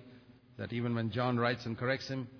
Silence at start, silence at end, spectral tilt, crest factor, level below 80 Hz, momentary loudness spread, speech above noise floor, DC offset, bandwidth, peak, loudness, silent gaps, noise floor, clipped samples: 0 s; 0 s; -5 dB/octave; 18 dB; -70 dBFS; 7 LU; 24 dB; under 0.1%; 5.4 kHz; -16 dBFS; -34 LUFS; none; -58 dBFS; under 0.1%